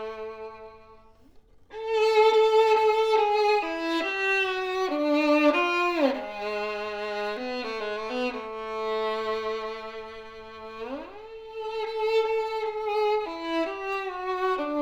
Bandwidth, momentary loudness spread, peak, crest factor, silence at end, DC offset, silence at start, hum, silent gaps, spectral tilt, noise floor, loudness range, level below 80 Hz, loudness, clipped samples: 10.5 kHz; 18 LU; -10 dBFS; 18 dB; 0 s; under 0.1%; 0 s; none; none; -3.5 dB/octave; -54 dBFS; 9 LU; -60 dBFS; -26 LUFS; under 0.1%